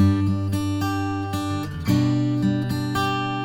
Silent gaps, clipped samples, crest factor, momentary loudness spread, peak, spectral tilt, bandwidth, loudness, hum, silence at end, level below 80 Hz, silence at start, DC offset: none; under 0.1%; 14 dB; 6 LU; -8 dBFS; -6.5 dB/octave; 17.5 kHz; -23 LUFS; none; 0 s; -48 dBFS; 0 s; under 0.1%